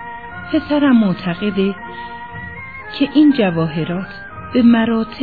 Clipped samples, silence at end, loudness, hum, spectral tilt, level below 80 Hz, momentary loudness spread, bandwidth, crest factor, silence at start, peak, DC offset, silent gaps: under 0.1%; 0 s; -16 LUFS; none; -9.5 dB/octave; -48 dBFS; 17 LU; 4.9 kHz; 14 dB; 0 s; -2 dBFS; 0.7%; none